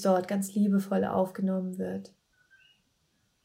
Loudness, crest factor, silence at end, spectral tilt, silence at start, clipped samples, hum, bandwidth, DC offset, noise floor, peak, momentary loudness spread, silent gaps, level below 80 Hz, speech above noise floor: -29 LUFS; 18 dB; 1.35 s; -7 dB/octave; 0 s; under 0.1%; none; 16 kHz; under 0.1%; -73 dBFS; -12 dBFS; 9 LU; none; -74 dBFS; 45 dB